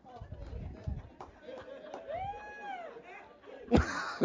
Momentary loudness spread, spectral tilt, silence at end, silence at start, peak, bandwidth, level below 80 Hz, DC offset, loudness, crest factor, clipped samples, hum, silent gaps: 21 LU; -6.5 dB/octave; 0 s; 0.05 s; -10 dBFS; 7.6 kHz; -46 dBFS; under 0.1%; -38 LUFS; 28 dB; under 0.1%; none; none